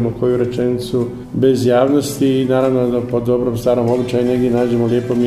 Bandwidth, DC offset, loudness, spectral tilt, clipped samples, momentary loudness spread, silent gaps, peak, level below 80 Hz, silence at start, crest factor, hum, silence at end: 15 kHz; under 0.1%; -16 LUFS; -7 dB/octave; under 0.1%; 5 LU; none; 0 dBFS; -44 dBFS; 0 s; 14 dB; none; 0 s